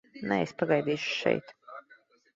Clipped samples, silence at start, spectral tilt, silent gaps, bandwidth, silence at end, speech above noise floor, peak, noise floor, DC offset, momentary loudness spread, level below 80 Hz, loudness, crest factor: under 0.1%; 0.15 s; -5.5 dB/octave; none; 7.8 kHz; 0.4 s; 32 dB; -8 dBFS; -61 dBFS; under 0.1%; 20 LU; -70 dBFS; -29 LUFS; 22 dB